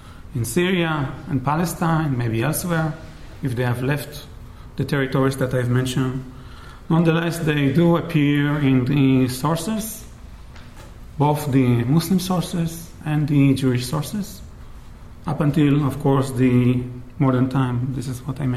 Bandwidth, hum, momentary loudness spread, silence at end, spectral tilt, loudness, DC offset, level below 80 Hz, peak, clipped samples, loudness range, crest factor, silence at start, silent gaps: 15 kHz; none; 16 LU; 0 s; -6.5 dB/octave; -21 LUFS; under 0.1%; -42 dBFS; -4 dBFS; under 0.1%; 4 LU; 16 dB; 0.05 s; none